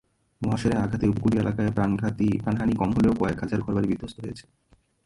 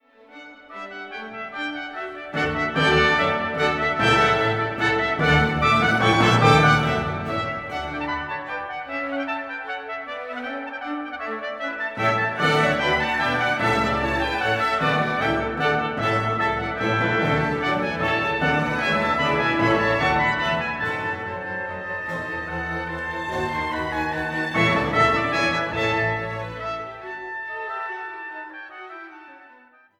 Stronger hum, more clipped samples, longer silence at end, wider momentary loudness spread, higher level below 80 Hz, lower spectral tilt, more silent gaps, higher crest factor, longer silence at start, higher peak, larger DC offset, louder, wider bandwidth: neither; neither; first, 0.65 s vs 0.5 s; second, 10 LU vs 14 LU; about the same, -44 dBFS vs -44 dBFS; first, -8 dB/octave vs -5.5 dB/octave; neither; about the same, 16 dB vs 20 dB; about the same, 0.4 s vs 0.3 s; second, -10 dBFS vs -2 dBFS; neither; second, -25 LUFS vs -22 LUFS; second, 11.5 kHz vs 15 kHz